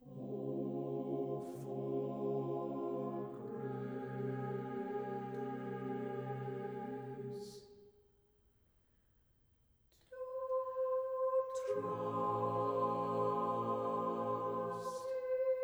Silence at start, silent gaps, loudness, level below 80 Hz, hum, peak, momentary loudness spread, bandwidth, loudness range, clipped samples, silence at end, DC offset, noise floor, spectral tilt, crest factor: 0 s; none; -40 LUFS; -78 dBFS; none; -24 dBFS; 9 LU; over 20 kHz; 11 LU; under 0.1%; 0 s; under 0.1%; -73 dBFS; -8 dB/octave; 16 dB